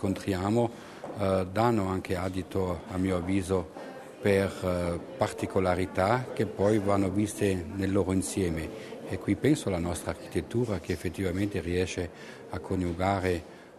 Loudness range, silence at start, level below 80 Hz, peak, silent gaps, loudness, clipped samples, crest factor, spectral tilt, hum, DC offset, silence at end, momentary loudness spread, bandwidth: 3 LU; 0 s; -52 dBFS; -10 dBFS; none; -29 LUFS; under 0.1%; 20 dB; -6.5 dB/octave; none; under 0.1%; 0 s; 9 LU; 13.5 kHz